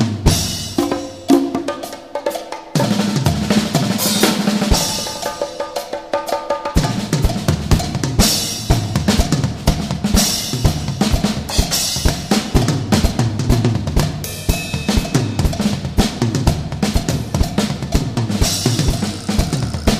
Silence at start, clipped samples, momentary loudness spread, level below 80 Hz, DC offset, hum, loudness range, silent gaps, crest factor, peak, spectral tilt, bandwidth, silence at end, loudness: 0 s; under 0.1%; 8 LU; -24 dBFS; 0.2%; none; 2 LU; none; 18 dB; 0 dBFS; -4.5 dB/octave; 15.5 kHz; 0 s; -18 LUFS